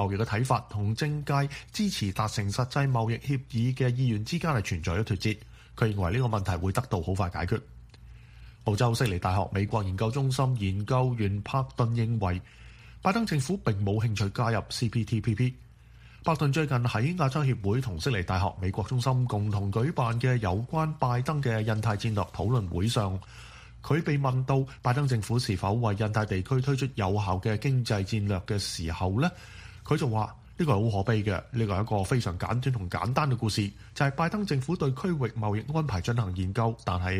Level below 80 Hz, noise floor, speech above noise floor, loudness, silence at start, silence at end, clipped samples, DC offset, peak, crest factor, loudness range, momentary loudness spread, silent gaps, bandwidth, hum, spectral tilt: -48 dBFS; -52 dBFS; 24 dB; -29 LUFS; 0 s; 0 s; under 0.1%; under 0.1%; -8 dBFS; 20 dB; 2 LU; 4 LU; none; 15 kHz; none; -6.5 dB/octave